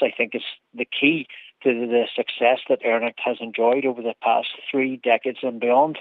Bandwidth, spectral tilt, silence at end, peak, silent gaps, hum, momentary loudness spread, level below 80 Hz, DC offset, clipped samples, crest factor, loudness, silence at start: 4.5 kHz; -7 dB/octave; 0 s; -4 dBFS; none; none; 8 LU; -86 dBFS; under 0.1%; under 0.1%; 18 dB; -22 LUFS; 0 s